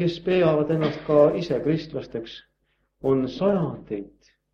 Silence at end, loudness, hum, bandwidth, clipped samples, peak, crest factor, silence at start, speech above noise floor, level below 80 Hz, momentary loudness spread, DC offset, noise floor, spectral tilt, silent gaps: 0.45 s; -23 LUFS; none; 7 kHz; under 0.1%; -6 dBFS; 18 dB; 0 s; 48 dB; -56 dBFS; 15 LU; under 0.1%; -71 dBFS; -8.5 dB/octave; none